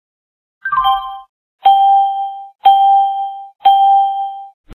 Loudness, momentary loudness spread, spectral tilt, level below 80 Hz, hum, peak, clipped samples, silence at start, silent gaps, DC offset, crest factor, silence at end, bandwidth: -13 LUFS; 16 LU; -2.5 dB/octave; -52 dBFS; none; 0 dBFS; under 0.1%; 0.65 s; 1.29-1.59 s, 2.55-2.59 s, 4.54-4.64 s; under 0.1%; 14 dB; 0.05 s; 13.5 kHz